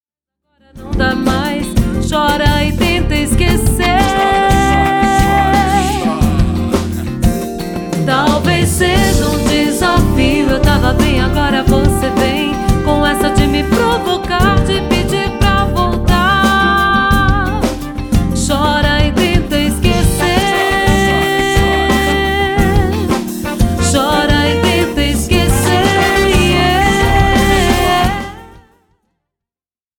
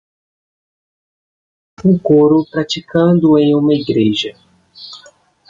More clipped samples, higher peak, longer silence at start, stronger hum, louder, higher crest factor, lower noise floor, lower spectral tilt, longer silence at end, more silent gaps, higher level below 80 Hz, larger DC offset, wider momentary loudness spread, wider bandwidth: neither; about the same, 0 dBFS vs -2 dBFS; second, 0.75 s vs 1.8 s; neither; about the same, -13 LUFS vs -13 LUFS; about the same, 12 dB vs 14 dB; first, under -90 dBFS vs -46 dBFS; second, -5 dB/octave vs -7 dB/octave; first, 1.4 s vs 0.55 s; neither; first, -20 dBFS vs -52 dBFS; neither; second, 5 LU vs 15 LU; first, 19 kHz vs 7.6 kHz